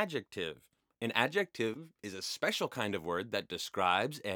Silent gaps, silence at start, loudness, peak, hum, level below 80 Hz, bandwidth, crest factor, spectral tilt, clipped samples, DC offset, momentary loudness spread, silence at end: none; 0 s; -35 LUFS; -10 dBFS; none; -78 dBFS; over 20 kHz; 26 dB; -3.5 dB/octave; under 0.1%; under 0.1%; 10 LU; 0 s